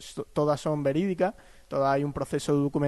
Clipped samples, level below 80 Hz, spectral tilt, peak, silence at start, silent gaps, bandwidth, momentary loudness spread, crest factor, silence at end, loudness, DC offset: under 0.1%; -54 dBFS; -7 dB/octave; -12 dBFS; 0 s; none; 12 kHz; 4 LU; 14 dB; 0 s; -28 LUFS; under 0.1%